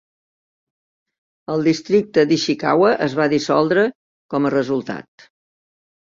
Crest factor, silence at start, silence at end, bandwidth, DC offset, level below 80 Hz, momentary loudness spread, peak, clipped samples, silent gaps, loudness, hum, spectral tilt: 18 dB; 1.5 s; 1.1 s; 7.6 kHz; under 0.1%; -60 dBFS; 10 LU; -2 dBFS; under 0.1%; 3.95-4.29 s; -18 LUFS; none; -5.5 dB/octave